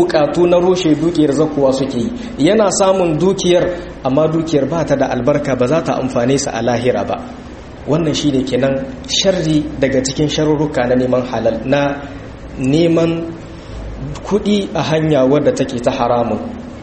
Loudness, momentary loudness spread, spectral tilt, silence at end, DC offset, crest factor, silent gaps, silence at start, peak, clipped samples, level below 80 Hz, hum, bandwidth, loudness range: -15 LUFS; 13 LU; -5.5 dB/octave; 0 s; under 0.1%; 14 dB; none; 0 s; 0 dBFS; under 0.1%; -36 dBFS; none; 8.8 kHz; 3 LU